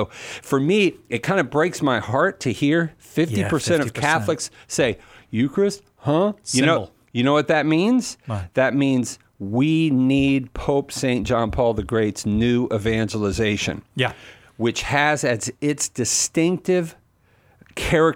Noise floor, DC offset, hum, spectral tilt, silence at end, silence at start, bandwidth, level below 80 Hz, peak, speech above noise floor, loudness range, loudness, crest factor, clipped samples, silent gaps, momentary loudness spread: -58 dBFS; under 0.1%; none; -5 dB/octave; 0 s; 0 s; 16.5 kHz; -44 dBFS; -2 dBFS; 38 dB; 2 LU; -21 LUFS; 18 dB; under 0.1%; none; 8 LU